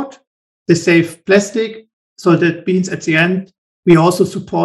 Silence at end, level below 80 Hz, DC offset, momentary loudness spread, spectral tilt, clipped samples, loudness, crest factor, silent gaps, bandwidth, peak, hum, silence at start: 0 s; -56 dBFS; under 0.1%; 11 LU; -6 dB/octave; under 0.1%; -14 LUFS; 14 dB; 0.27-0.66 s, 1.93-2.16 s, 3.58-3.83 s; 12.5 kHz; 0 dBFS; none; 0 s